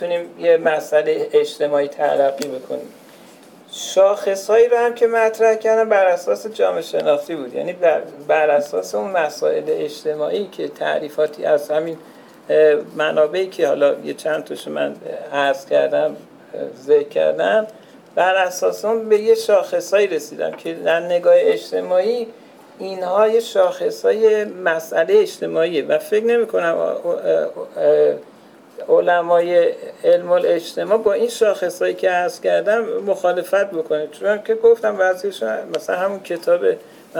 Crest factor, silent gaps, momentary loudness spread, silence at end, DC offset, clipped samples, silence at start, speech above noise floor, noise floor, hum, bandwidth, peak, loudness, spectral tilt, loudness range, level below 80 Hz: 14 dB; none; 10 LU; 0 s; under 0.1%; under 0.1%; 0 s; 27 dB; -44 dBFS; none; 18 kHz; -4 dBFS; -18 LUFS; -4 dB/octave; 3 LU; -72 dBFS